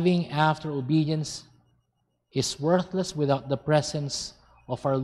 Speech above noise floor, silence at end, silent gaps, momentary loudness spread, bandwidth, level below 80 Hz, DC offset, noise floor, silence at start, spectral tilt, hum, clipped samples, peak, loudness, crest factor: 49 dB; 0 s; none; 9 LU; 12.5 kHz; -58 dBFS; under 0.1%; -75 dBFS; 0 s; -5.5 dB/octave; none; under 0.1%; -6 dBFS; -27 LUFS; 20 dB